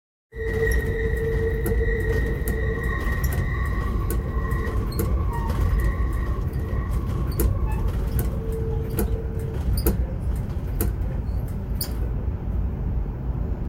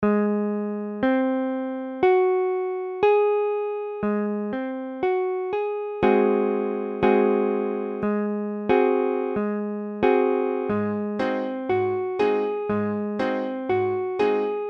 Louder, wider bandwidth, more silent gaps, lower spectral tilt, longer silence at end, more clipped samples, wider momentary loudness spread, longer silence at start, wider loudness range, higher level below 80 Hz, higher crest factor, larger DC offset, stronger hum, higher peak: about the same, -26 LUFS vs -24 LUFS; first, 17 kHz vs 5.8 kHz; neither; second, -6.5 dB/octave vs -8.5 dB/octave; about the same, 0 s vs 0 s; neither; second, 5 LU vs 8 LU; first, 0.35 s vs 0 s; about the same, 2 LU vs 2 LU; first, -26 dBFS vs -58 dBFS; about the same, 18 dB vs 16 dB; neither; neither; about the same, -6 dBFS vs -6 dBFS